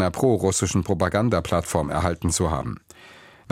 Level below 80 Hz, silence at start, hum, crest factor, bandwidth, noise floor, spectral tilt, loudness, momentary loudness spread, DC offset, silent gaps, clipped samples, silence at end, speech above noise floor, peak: -40 dBFS; 0 s; none; 18 dB; 16 kHz; -48 dBFS; -5 dB/octave; -23 LUFS; 6 LU; under 0.1%; none; under 0.1%; 0.4 s; 26 dB; -6 dBFS